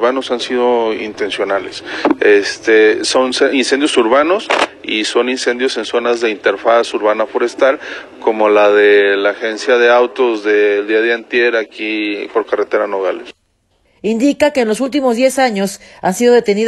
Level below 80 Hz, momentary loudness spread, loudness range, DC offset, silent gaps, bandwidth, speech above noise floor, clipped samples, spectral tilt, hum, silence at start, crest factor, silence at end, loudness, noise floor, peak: -56 dBFS; 9 LU; 5 LU; under 0.1%; none; 12.5 kHz; 46 dB; under 0.1%; -3.5 dB/octave; none; 0 s; 14 dB; 0 s; -13 LUFS; -59 dBFS; 0 dBFS